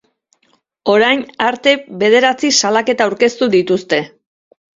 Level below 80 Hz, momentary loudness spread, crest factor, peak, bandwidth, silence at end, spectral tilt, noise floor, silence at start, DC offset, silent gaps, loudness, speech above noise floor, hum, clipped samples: -60 dBFS; 7 LU; 16 dB; 0 dBFS; 7.8 kHz; 0.7 s; -3 dB/octave; -60 dBFS; 0.85 s; under 0.1%; none; -14 LUFS; 46 dB; none; under 0.1%